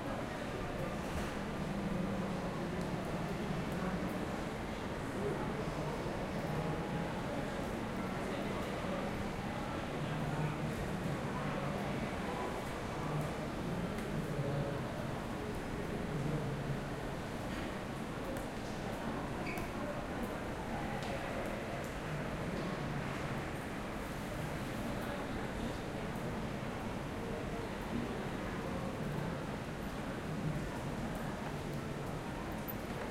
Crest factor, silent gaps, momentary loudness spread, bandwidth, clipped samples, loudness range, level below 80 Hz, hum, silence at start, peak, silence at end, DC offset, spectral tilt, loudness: 14 dB; none; 3 LU; 16 kHz; under 0.1%; 2 LU; -50 dBFS; none; 0 s; -24 dBFS; 0 s; under 0.1%; -6 dB/octave; -40 LUFS